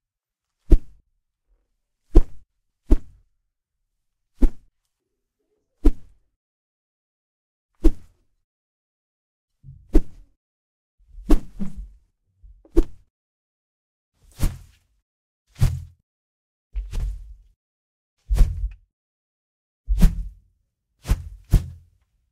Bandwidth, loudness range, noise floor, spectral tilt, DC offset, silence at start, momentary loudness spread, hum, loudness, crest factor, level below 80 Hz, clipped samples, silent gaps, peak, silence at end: 13.5 kHz; 6 LU; -86 dBFS; -7.5 dB/octave; under 0.1%; 0.7 s; 17 LU; none; -26 LUFS; 24 dB; -26 dBFS; under 0.1%; 6.36-7.69 s, 8.44-9.48 s, 10.37-10.98 s, 13.10-14.12 s, 15.02-15.45 s, 16.03-16.70 s, 17.56-18.17 s, 18.93-19.84 s; 0 dBFS; 0.6 s